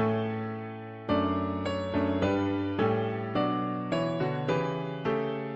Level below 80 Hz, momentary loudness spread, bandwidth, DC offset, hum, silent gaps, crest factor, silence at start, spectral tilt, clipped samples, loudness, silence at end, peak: -58 dBFS; 5 LU; 7.8 kHz; under 0.1%; none; none; 16 dB; 0 s; -8 dB/octave; under 0.1%; -30 LUFS; 0 s; -14 dBFS